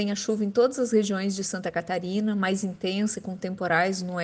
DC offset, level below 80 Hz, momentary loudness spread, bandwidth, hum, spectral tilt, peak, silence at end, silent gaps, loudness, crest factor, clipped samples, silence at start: under 0.1%; -66 dBFS; 6 LU; 9.8 kHz; none; -4.5 dB/octave; -10 dBFS; 0 s; none; -26 LUFS; 16 dB; under 0.1%; 0 s